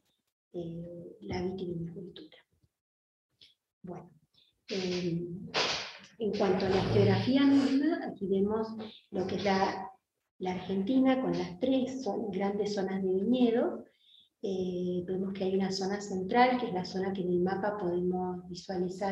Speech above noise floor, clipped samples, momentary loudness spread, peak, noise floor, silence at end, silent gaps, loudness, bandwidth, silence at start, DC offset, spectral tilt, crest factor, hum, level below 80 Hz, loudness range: 39 dB; under 0.1%; 16 LU; -10 dBFS; -69 dBFS; 0 s; 2.81-3.29 s, 3.73-3.81 s, 10.31-10.39 s; -31 LUFS; 8.4 kHz; 0.55 s; under 0.1%; -6.5 dB/octave; 22 dB; none; -62 dBFS; 13 LU